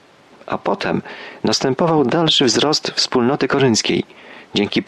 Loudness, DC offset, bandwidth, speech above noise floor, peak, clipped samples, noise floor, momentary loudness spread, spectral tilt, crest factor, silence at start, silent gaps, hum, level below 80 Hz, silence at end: -17 LUFS; under 0.1%; 12.5 kHz; 24 dB; -4 dBFS; under 0.1%; -41 dBFS; 10 LU; -4 dB/octave; 14 dB; 0.45 s; none; none; -56 dBFS; 0.05 s